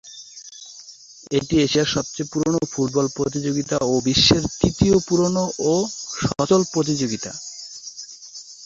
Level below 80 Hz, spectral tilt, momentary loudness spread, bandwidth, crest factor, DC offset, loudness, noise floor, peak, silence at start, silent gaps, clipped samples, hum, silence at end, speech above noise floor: -44 dBFS; -4.5 dB/octave; 20 LU; 8 kHz; 20 dB; under 0.1%; -20 LUFS; -44 dBFS; -2 dBFS; 0.05 s; none; under 0.1%; none; 0 s; 24 dB